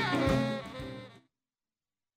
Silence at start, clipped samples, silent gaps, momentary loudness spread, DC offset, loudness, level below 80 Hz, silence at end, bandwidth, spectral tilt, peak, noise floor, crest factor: 0 s; under 0.1%; none; 19 LU; under 0.1%; -32 LUFS; -50 dBFS; 1 s; 15.5 kHz; -6 dB/octave; -14 dBFS; under -90 dBFS; 20 dB